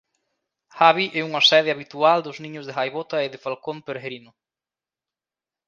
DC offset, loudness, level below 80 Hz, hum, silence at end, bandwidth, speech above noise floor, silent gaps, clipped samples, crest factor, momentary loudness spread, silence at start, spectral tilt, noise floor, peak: under 0.1%; -20 LUFS; -76 dBFS; none; 1.5 s; 7.4 kHz; over 68 dB; none; under 0.1%; 24 dB; 18 LU; 0.75 s; -3.5 dB/octave; under -90 dBFS; 0 dBFS